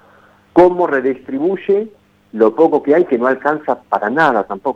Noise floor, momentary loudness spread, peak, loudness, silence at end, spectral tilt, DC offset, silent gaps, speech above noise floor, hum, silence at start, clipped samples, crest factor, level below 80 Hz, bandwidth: -48 dBFS; 8 LU; 0 dBFS; -15 LUFS; 0 s; -7.5 dB/octave; under 0.1%; none; 34 dB; none; 0.55 s; under 0.1%; 14 dB; -52 dBFS; 7.2 kHz